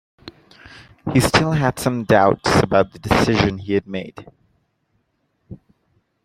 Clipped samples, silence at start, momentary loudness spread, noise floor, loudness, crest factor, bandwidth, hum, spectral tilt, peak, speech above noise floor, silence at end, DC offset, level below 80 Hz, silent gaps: under 0.1%; 0.25 s; 13 LU; -68 dBFS; -18 LUFS; 20 dB; 16 kHz; none; -5.5 dB/octave; 0 dBFS; 51 dB; 0.7 s; under 0.1%; -42 dBFS; none